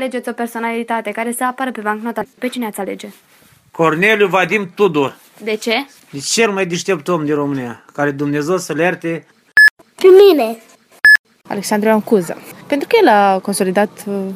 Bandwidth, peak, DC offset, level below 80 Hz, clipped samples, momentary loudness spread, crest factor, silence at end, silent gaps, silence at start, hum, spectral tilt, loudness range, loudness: 15.5 kHz; 0 dBFS; under 0.1%; -64 dBFS; under 0.1%; 16 LU; 16 dB; 0 s; 9.70-9.77 s, 11.19-11.24 s; 0 s; none; -4 dB/octave; 8 LU; -14 LUFS